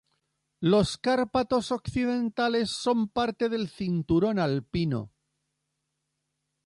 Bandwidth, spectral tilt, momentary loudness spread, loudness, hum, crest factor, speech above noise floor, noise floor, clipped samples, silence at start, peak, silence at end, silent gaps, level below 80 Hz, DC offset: 11.5 kHz; -6 dB/octave; 6 LU; -27 LUFS; none; 16 dB; 54 dB; -81 dBFS; under 0.1%; 0.6 s; -12 dBFS; 1.6 s; none; -54 dBFS; under 0.1%